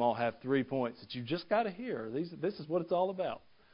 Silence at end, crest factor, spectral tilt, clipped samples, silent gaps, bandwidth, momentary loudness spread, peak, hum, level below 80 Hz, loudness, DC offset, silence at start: 0.35 s; 18 dB; -5 dB/octave; under 0.1%; none; 5.2 kHz; 7 LU; -16 dBFS; none; -72 dBFS; -35 LUFS; under 0.1%; 0 s